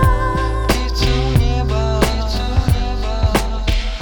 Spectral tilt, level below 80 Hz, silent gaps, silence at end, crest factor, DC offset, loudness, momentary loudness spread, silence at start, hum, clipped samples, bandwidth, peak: -5.5 dB/octave; -18 dBFS; none; 0 s; 16 dB; under 0.1%; -18 LUFS; 4 LU; 0 s; none; under 0.1%; over 20 kHz; 0 dBFS